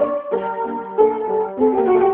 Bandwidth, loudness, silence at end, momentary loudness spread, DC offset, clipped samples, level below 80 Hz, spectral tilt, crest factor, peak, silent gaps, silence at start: 3.6 kHz; -19 LUFS; 0 s; 8 LU; under 0.1%; under 0.1%; -56 dBFS; -11.5 dB/octave; 16 dB; -2 dBFS; none; 0 s